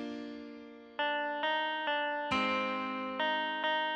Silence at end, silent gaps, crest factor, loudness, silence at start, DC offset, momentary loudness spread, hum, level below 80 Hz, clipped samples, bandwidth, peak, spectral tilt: 0 s; none; 14 dB; -33 LUFS; 0 s; under 0.1%; 14 LU; none; -70 dBFS; under 0.1%; 9.4 kHz; -20 dBFS; -4 dB/octave